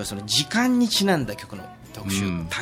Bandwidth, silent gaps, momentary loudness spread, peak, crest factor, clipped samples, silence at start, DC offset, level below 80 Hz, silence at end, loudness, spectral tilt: 16.5 kHz; none; 18 LU; -8 dBFS; 16 dB; under 0.1%; 0 s; under 0.1%; -50 dBFS; 0 s; -22 LUFS; -3.5 dB/octave